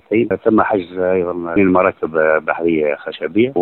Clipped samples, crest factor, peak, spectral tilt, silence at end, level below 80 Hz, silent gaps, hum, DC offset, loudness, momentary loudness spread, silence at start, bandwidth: under 0.1%; 16 dB; 0 dBFS; -10.5 dB/octave; 0 s; -50 dBFS; none; none; under 0.1%; -16 LUFS; 5 LU; 0.1 s; 4.3 kHz